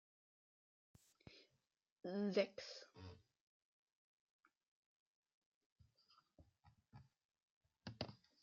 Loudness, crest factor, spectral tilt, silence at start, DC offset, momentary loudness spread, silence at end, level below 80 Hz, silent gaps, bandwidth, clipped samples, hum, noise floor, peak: -46 LUFS; 28 dB; -4.5 dB/octave; 1.25 s; under 0.1%; 27 LU; 0.25 s; -84 dBFS; 1.92-1.96 s, 3.41-4.39 s, 4.68-5.23 s, 5.34-5.76 s, 7.25-7.29 s, 7.42-7.61 s; 7.2 kHz; under 0.1%; none; -89 dBFS; -26 dBFS